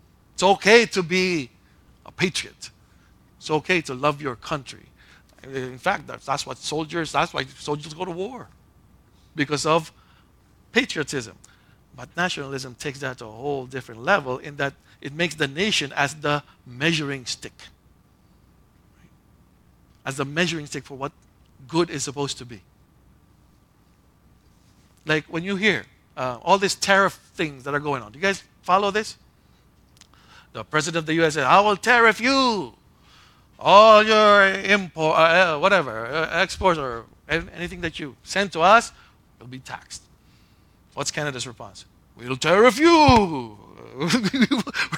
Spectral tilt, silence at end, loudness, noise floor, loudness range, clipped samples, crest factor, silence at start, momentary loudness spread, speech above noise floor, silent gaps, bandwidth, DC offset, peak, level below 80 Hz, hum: -4 dB/octave; 0 s; -21 LUFS; -58 dBFS; 14 LU; under 0.1%; 24 dB; 0.4 s; 21 LU; 36 dB; none; 16.5 kHz; under 0.1%; 0 dBFS; -50 dBFS; none